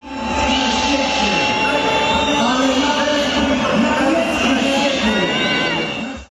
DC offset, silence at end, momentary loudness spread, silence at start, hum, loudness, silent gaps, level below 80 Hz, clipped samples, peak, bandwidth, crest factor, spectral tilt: under 0.1%; 0.05 s; 2 LU; 0.05 s; none; -16 LUFS; none; -38 dBFS; under 0.1%; -6 dBFS; 13 kHz; 10 dB; -3.5 dB/octave